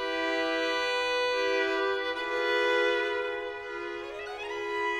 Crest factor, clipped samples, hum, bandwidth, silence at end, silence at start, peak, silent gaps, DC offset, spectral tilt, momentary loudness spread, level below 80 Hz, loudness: 14 dB; under 0.1%; none; 13.5 kHz; 0 s; 0 s; -16 dBFS; none; under 0.1%; -2 dB/octave; 11 LU; -64 dBFS; -29 LUFS